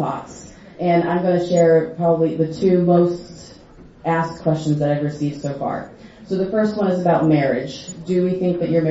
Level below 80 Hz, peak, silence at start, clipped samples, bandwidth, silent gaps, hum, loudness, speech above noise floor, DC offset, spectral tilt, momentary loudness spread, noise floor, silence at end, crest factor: -52 dBFS; -4 dBFS; 0 s; under 0.1%; 8 kHz; none; none; -19 LUFS; 23 dB; under 0.1%; -7.5 dB/octave; 14 LU; -41 dBFS; 0 s; 16 dB